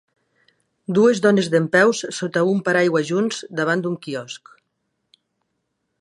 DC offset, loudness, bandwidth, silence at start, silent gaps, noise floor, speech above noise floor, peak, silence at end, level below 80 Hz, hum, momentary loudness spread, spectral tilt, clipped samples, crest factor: under 0.1%; -19 LUFS; 11.5 kHz; 0.9 s; none; -74 dBFS; 55 dB; -2 dBFS; 1.65 s; -70 dBFS; none; 14 LU; -5 dB/octave; under 0.1%; 18 dB